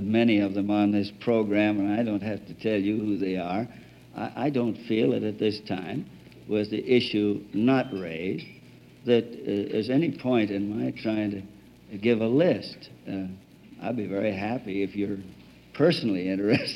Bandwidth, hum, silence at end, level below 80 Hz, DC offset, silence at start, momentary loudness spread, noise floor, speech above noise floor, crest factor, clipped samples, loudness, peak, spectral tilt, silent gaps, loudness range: 11 kHz; none; 0 s; -64 dBFS; under 0.1%; 0 s; 14 LU; -50 dBFS; 24 dB; 18 dB; under 0.1%; -27 LUFS; -8 dBFS; -7.5 dB/octave; none; 3 LU